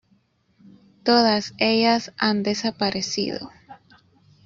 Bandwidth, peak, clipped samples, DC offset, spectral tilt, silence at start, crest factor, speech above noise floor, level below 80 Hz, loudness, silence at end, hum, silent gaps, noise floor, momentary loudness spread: 7.6 kHz; -2 dBFS; under 0.1%; under 0.1%; -4 dB/octave; 1.05 s; 22 dB; 42 dB; -62 dBFS; -21 LUFS; 0.7 s; none; none; -63 dBFS; 10 LU